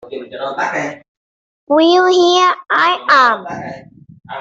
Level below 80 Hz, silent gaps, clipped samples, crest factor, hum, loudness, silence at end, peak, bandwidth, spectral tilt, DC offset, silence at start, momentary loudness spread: -62 dBFS; 1.08-1.67 s; under 0.1%; 12 dB; none; -13 LUFS; 0 s; -2 dBFS; 7.8 kHz; -3 dB/octave; under 0.1%; 0.05 s; 17 LU